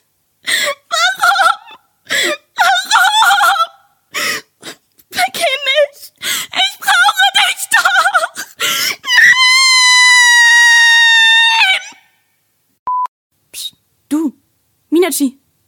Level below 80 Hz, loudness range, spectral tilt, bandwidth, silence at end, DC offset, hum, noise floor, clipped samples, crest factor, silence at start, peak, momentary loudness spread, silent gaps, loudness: -70 dBFS; 11 LU; 1 dB/octave; 18 kHz; 0.35 s; under 0.1%; none; -61 dBFS; under 0.1%; 12 dB; 0.45 s; 0 dBFS; 16 LU; 12.79-12.86 s, 13.08-13.30 s; -10 LUFS